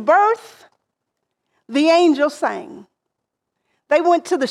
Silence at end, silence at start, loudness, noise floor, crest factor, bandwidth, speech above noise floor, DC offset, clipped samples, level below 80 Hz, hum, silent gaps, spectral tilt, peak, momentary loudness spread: 0 s; 0 s; -17 LUFS; -79 dBFS; 16 dB; 12.5 kHz; 62 dB; under 0.1%; under 0.1%; -72 dBFS; none; none; -3.5 dB/octave; -4 dBFS; 12 LU